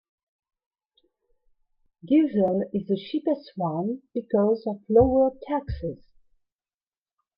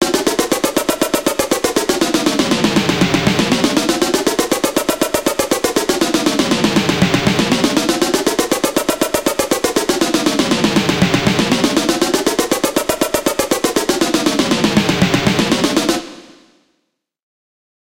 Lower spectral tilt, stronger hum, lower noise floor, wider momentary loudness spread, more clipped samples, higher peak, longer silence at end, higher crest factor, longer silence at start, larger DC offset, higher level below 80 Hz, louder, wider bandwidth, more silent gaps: first, -11 dB/octave vs -3.5 dB/octave; neither; first, under -90 dBFS vs -69 dBFS; first, 12 LU vs 3 LU; neither; second, -6 dBFS vs 0 dBFS; second, 1.4 s vs 1.75 s; about the same, 20 dB vs 16 dB; first, 2.05 s vs 0 s; second, under 0.1% vs 0.2%; second, -48 dBFS vs -42 dBFS; second, -25 LUFS vs -15 LUFS; second, 5.4 kHz vs 17 kHz; neither